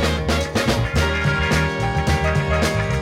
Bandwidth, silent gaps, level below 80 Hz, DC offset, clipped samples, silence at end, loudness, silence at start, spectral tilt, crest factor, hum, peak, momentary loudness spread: 16 kHz; none; -28 dBFS; under 0.1%; under 0.1%; 0 s; -20 LUFS; 0 s; -5 dB/octave; 14 dB; none; -4 dBFS; 2 LU